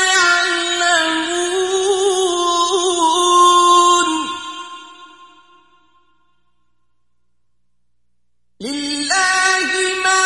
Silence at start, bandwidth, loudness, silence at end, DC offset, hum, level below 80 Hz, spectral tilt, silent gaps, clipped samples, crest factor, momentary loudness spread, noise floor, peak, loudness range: 0 s; 11.5 kHz; -14 LUFS; 0 s; 0.1%; 60 Hz at -70 dBFS; -60 dBFS; 0 dB/octave; none; under 0.1%; 16 dB; 15 LU; -74 dBFS; 0 dBFS; 15 LU